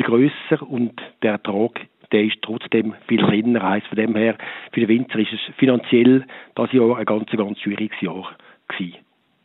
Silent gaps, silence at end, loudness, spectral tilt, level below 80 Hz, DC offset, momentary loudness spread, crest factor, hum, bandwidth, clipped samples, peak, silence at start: none; 0.45 s; -20 LUFS; -11 dB/octave; -74 dBFS; under 0.1%; 13 LU; 16 dB; none; 4.1 kHz; under 0.1%; -2 dBFS; 0 s